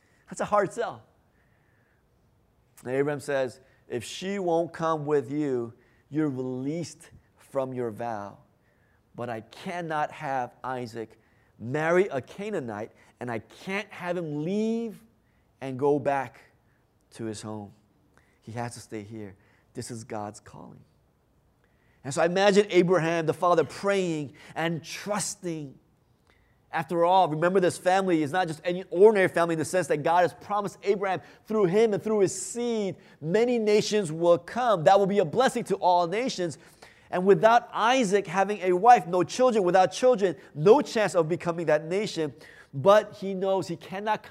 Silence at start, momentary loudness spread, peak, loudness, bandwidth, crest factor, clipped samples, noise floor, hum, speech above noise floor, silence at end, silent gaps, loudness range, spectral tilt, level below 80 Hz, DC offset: 0.3 s; 17 LU; -6 dBFS; -26 LUFS; 14 kHz; 22 dB; under 0.1%; -66 dBFS; none; 40 dB; 0 s; none; 12 LU; -5 dB/octave; -70 dBFS; under 0.1%